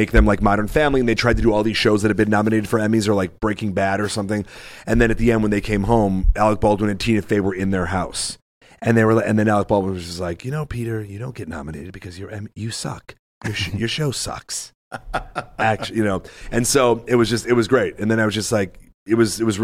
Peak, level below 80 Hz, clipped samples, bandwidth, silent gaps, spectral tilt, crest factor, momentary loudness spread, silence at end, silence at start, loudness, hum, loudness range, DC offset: -4 dBFS; -30 dBFS; under 0.1%; 15.5 kHz; 8.42-8.61 s, 13.19-13.41 s, 14.75-14.91 s, 18.94-19.06 s; -5.5 dB/octave; 16 dB; 14 LU; 0 s; 0 s; -20 LUFS; none; 8 LU; under 0.1%